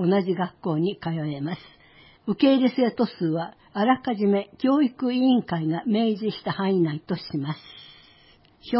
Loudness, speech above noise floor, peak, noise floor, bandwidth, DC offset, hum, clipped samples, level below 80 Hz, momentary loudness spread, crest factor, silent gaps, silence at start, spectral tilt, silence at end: -24 LUFS; 32 dB; -8 dBFS; -56 dBFS; 5.8 kHz; under 0.1%; none; under 0.1%; -64 dBFS; 12 LU; 16 dB; none; 0 s; -11.5 dB/octave; 0 s